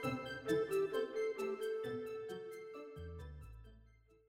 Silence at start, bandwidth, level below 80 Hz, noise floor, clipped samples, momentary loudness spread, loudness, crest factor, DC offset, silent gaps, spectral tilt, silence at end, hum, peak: 0 s; 16 kHz; -62 dBFS; -66 dBFS; under 0.1%; 16 LU; -41 LUFS; 18 dB; under 0.1%; none; -5.5 dB/octave; 0.4 s; none; -24 dBFS